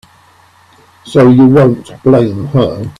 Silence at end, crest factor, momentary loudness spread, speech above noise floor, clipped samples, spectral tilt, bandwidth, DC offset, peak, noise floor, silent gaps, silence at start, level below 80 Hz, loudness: 0.1 s; 10 dB; 8 LU; 37 dB; under 0.1%; -8.5 dB/octave; 10.5 kHz; under 0.1%; 0 dBFS; -45 dBFS; none; 1.05 s; -44 dBFS; -9 LUFS